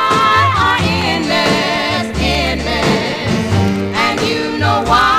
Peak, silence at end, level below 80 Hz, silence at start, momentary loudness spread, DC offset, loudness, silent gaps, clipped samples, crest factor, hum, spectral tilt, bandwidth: 0 dBFS; 0 s; -30 dBFS; 0 s; 5 LU; 0.2%; -14 LUFS; none; under 0.1%; 12 dB; none; -4.5 dB/octave; 16 kHz